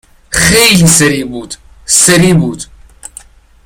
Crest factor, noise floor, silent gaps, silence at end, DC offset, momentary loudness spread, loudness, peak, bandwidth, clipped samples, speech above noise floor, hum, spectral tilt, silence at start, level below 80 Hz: 10 dB; -36 dBFS; none; 1 s; under 0.1%; 21 LU; -7 LUFS; 0 dBFS; over 20 kHz; 0.4%; 28 dB; none; -3 dB/octave; 0.3 s; -32 dBFS